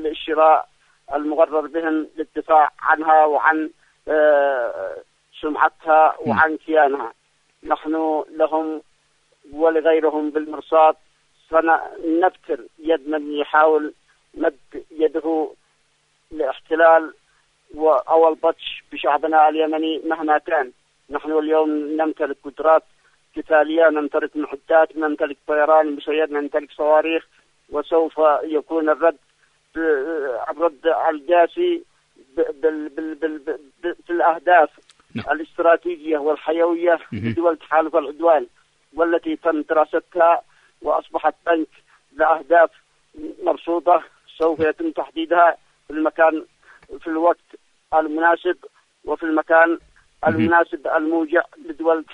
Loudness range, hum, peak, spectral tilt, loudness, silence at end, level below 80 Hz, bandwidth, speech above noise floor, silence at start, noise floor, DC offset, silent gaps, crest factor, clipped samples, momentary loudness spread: 3 LU; none; -2 dBFS; -7 dB/octave; -19 LUFS; 0 s; -58 dBFS; 5.6 kHz; 45 dB; 0 s; -63 dBFS; under 0.1%; none; 18 dB; under 0.1%; 14 LU